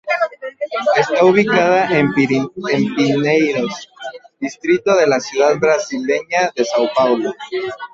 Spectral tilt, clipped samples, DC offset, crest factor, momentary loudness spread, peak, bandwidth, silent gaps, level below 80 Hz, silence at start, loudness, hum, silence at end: -5 dB/octave; under 0.1%; under 0.1%; 14 dB; 11 LU; -2 dBFS; 7.8 kHz; none; -58 dBFS; 0.05 s; -16 LUFS; none; 0.05 s